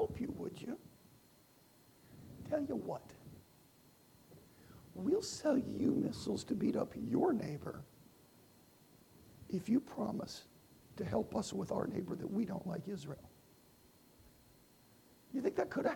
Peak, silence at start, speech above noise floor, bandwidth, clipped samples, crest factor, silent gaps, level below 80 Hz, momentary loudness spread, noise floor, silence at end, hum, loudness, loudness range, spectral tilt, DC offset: -22 dBFS; 0 s; 29 dB; 19 kHz; under 0.1%; 20 dB; none; -68 dBFS; 22 LU; -66 dBFS; 0 s; none; -39 LUFS; 10 LU; -6 dB/octave; under 0.1%